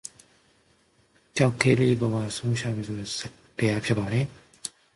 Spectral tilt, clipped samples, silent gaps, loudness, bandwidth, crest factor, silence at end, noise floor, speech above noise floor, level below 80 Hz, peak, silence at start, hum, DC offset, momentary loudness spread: -5.5 dB/octave; under 0.1%; none; -26 LUFS; 11.5 kHz; 22 dB; 0.25 s; -64 dBFS; 39 dB; -56 dBFS; -4 dBFS; 1.35 s; none; under 0.1%; 17 LU